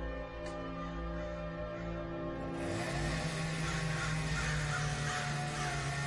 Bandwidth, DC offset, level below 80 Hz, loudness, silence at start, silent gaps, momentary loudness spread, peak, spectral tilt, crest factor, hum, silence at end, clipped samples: 11.5 kHz; under 0.1%; -46 dBFS; -37 LUFS; 0 s; none; 7 LU; -24 dBFS; -4.5 dB/octave; 14 dB; none; 0 s; under 0.1%